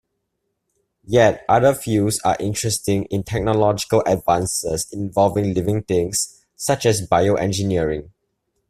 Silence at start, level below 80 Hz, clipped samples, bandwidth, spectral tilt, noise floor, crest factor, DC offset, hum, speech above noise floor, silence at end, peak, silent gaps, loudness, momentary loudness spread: 1.1 s; -46 dBFS; under 0.1%; 15.5 kHz; -5 dB/octave; -75 dBFS; 18 dB; under 0.1%; none; 56 dB; 0.6 s; -2 dBFS; none; -19 LUFS; 7 LU